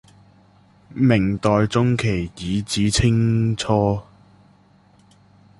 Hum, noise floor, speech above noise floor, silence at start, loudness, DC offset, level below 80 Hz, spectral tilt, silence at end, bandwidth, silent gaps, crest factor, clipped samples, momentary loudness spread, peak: none; -54 dBFS; 35 dB; 0.9 s; -20 LUFS; under 0.1%; -40 dBFS; -6 dB/octave; 1.6 s; 11.5 kHz; none; 18 dB; under 0.1%; 8 LU; -2 dBFS